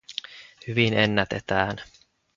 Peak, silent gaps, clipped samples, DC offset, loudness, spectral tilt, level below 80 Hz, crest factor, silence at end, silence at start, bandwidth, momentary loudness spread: -2 dBFS; none; under 0.1%; under 0.1%; -24 LUFS; -6 dB/octave; -52 dBFS; 24 dB; 0.5 s; 0.1 s; 7.6 kHz; 18 LU